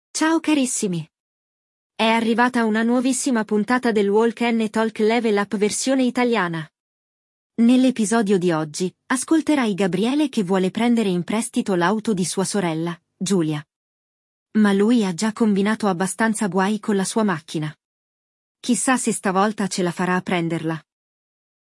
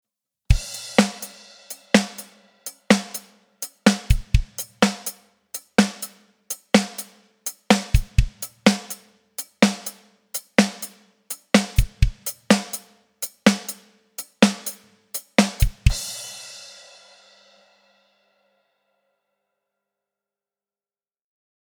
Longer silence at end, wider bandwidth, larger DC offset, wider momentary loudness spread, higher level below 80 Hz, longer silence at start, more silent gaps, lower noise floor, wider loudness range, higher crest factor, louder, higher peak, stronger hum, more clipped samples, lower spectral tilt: second, 0.8 s vs 5.05 s; second, 12 kHz vs over 20 kHz; neither; second, 8 LU vs 17 LU; second, -70 dBFS vs -30 dBFS; second, 0.15 s vs 0.5 s; first, 1.20-1.90 s, 6.80-7.50 s, 13.76-14.46 s, 17.85-18.55 s vs none; about the same, under -90 dBFS vs under -90 dBFS; about the same, 3 LU vs 4 LU; second, 16 dB vs 24 dB; about the same, -20 LUFS vs -22 LUFS; second, -4 dBFS vs 0 dBFS; neither; neither; about the same, -4.5 dB/octave vs -4.5 dB/octave